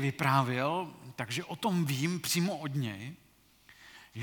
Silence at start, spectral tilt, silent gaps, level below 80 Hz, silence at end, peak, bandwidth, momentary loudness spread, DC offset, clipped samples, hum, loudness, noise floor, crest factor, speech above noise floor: 0 s; -5 dB/octave; none; -72 dBFS; 0 s; -12 dBFS; 19 kHz; 18 LU; under 0.1%; under 0.1%; none; -32 LUFS; -61 dBFS; 22 dB; 30 dB